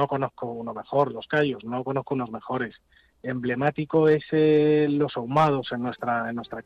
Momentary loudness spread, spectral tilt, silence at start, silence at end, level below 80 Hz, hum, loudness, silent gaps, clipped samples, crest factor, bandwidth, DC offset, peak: 11 LU; -8.5 dB/octave; 0 s; 0.05 s; -62 dBFS; none; -25 LUFS; none; under 0.1%; 14 dB; 6.6 kHz; under 0.1%; -10 dBFS